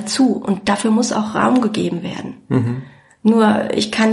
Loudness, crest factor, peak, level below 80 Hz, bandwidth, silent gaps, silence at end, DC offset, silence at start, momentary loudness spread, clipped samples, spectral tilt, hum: -17 LUFS; 16 dB; -2 dBFS; -54 dBFS; 11.5 kHz; none; 0 s; under 0.1%; 0 s; 10 LU; under 0.1%; -5 dB/octave; none